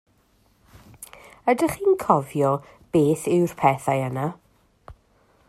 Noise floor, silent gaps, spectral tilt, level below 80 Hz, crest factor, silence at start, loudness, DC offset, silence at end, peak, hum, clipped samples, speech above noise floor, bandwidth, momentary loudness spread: -62 dBFS; none; -7 dB/octave; -56 dBFS; 22 dB; 1 s; -22 LUFS; under 0.1%; 0.55 s; -2 dBFS; none; under 0.1%; 41 dB; 14.5 kHz; 16 LU